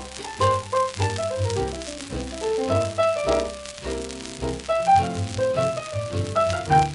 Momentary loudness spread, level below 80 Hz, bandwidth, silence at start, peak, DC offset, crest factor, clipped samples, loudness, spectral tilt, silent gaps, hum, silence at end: 12 LU; -42 dBFS; 11.5 kHz; 0 s; -6 dBFS; under 0.1%; 18 dB; under 0.1%; -24 LUFS; -5 dB/octave; none; none; 0 s